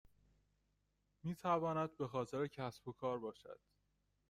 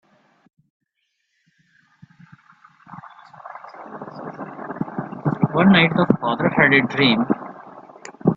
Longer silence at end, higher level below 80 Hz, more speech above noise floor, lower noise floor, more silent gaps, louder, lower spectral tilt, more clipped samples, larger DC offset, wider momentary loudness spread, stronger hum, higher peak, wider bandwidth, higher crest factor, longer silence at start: first, 0.75 s vs 0 s; second, -76 dBFS vs -58 dBFS; second, 40 dB vs 57 dB; first, -82 dBFS vs -73 dBFS; neither; second, -43 LUFS vs -18 LUFS; about the same, -7 dB/octave vs -7 dB/octave; neither; neither; second, 16 LU vs 26 LU; first, 50 Hz at -70 dBFS vs none; second, -24 dBFS vs 0 dBFS; first, 15.5 kHz vs 7.6 kHz; about the same, 20 dB vs 22 dB; second, 1.25 s vs 2.9 s